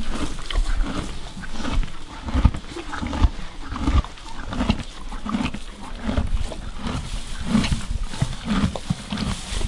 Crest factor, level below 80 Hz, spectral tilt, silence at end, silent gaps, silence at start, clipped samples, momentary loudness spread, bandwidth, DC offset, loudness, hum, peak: 24 dB; -26 dBFS; -5.5 dB/octave; 0 s; none; 0 s; under 0.1%; 12 LU; 11.5 kHz; under 0.1%; -27 LUFS; none; 0 dBFS